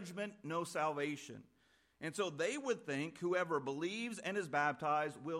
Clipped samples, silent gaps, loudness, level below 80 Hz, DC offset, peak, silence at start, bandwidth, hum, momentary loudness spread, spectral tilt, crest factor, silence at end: under 0.1%; none; -39 LUFS; -84 dBFS; under 0.1%; -22 dBFS; 0 s; 16 kHz; none; 9 LU; -4.5 dB/octave; 18 dB; 0 s